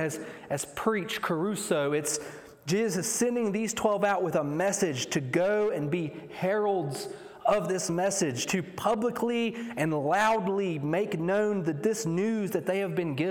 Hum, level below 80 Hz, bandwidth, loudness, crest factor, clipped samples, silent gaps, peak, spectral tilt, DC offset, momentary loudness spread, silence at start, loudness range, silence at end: none; -66 dBFS; 18 kHz; -29 LUFS; 16 dB; under 0.1%; none; -12 dBFS; -4.5 dB/octave; under 0.1%; 6 LU; 0 s; 2 LU; 0 s